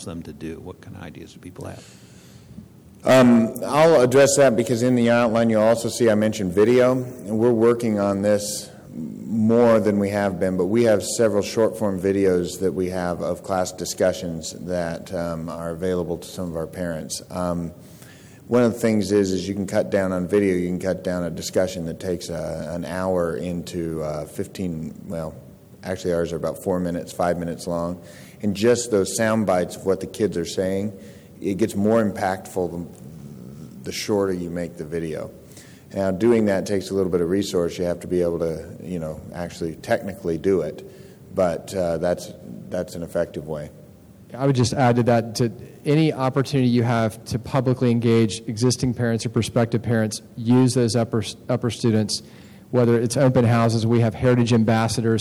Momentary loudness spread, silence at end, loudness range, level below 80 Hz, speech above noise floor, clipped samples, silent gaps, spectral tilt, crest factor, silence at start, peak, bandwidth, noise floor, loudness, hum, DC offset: 14 LU; 0 s; 9 LU; -52 dBFS; 25 dB; under 0.1%; none; -6 dB/octave; 14 dB; 0 s; -8 dBFS; 18.5 kHz; -46 dBFS; -22 LUFS; none; under 0.1%